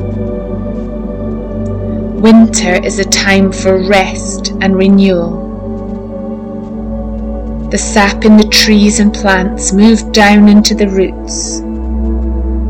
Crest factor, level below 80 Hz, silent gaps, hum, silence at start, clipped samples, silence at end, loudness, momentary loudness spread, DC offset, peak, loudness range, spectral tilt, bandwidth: 10 dB; -22 dBFS; none; none; 0 s; 1%; 0 s; -10 LUFS; 15 LU; under 0.1%; 0 dBFS; 7 LU; -4.5 dB/octave; 16.5 kHz